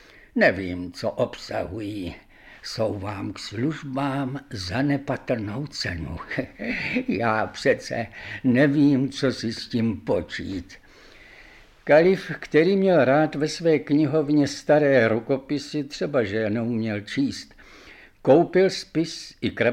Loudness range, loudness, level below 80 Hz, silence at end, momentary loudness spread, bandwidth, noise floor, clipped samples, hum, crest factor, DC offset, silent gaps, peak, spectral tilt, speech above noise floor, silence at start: 8 LU; -23 LUFS; -52 dBFS; 0 s; 13 LU; 12 kHz; -49 dBFS; under 0.1%; none; 18 dB; under 0.1%; none; -4 dBFS; -6 dB/octave; 27 dB; 0.35 s